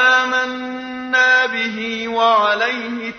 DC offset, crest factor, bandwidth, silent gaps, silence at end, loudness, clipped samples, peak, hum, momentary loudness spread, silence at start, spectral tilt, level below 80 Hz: under 0.1%; 14 dB; 6.6 kHz; none; 0 s; -16 LUFS; under 0.1%; -4 dBFS; none; 11 LU; 0 s; -2.5 dB/octave; -60 dBFS